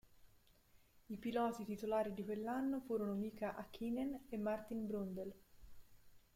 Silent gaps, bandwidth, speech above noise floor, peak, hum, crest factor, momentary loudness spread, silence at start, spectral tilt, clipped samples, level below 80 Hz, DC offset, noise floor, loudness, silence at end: none; 16.5 kHz; 27 dB; -28 dBFS; none; 16 dB; 7 LU; 0.05 s; -7 dB/octave; under 0.1%; -68 dBFS; under 0.1%; -70 dBFS; -43 LUFS; 0.15 s